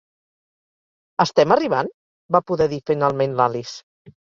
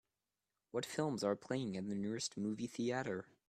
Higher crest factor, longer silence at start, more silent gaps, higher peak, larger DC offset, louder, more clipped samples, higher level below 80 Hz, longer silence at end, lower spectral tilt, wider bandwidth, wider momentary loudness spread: about the same, 20 dB vs 18 dB; first, 1.2 s vs 0.75 s; first, 1.94-2.29 s, 3.83-4.05 s vs none; first, -2 dBFS vs -24 dBFS; neither; first, -20 LUFS vs -41 LUFS; neither; first, -58 dBFS vs -78 dBFS; about the same, 0.2 s vs 0.25 s; about the same, -6 dB/octave vs -5 dB/octave; second, 7.6 kHz vs 14 kHz; first, 14 LU vs 5 LU